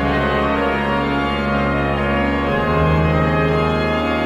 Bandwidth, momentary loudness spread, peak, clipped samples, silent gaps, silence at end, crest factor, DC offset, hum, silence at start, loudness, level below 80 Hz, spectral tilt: 10.5 kHz; 2 LU; -4 dBFS; under 0.1%; none; 0 s; 14 dB; under 0.1%; none; 0 s; -18 LUFS; -28 dBFS; -7.5 dB/octave